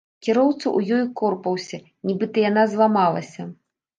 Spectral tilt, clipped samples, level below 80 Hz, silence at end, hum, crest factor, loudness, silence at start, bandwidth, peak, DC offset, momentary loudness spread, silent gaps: -6.5 dB/octave; under 0.1%; -72 dBFS; 0.45 s; none; 16 dB; -21 LUFS; 0.25 s; 9 kHz; -4 dBFS; under 0.1%; 15 LU; none